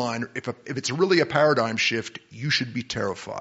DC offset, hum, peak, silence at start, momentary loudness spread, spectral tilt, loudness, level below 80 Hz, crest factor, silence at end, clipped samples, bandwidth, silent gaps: under 0.1%; none; -4 dBFS; 0 s; 12 LU; -3 dB/octave; -24 LUFS; -62 dBFS; 20 dB; 0 s; under 0.1%; 8 kHz; none